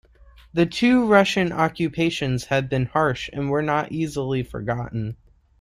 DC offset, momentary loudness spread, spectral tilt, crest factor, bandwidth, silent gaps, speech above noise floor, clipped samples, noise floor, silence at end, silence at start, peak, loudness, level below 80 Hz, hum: under 0.1%; 11 LU; -6 dB/octave; 18 dB; 14 kHz; none; 29 dB; under 0.1%; -50 dBFS; 0.45 s; 0.55 s; -4 dBFS; -22 LUFS; -48 dBFS; none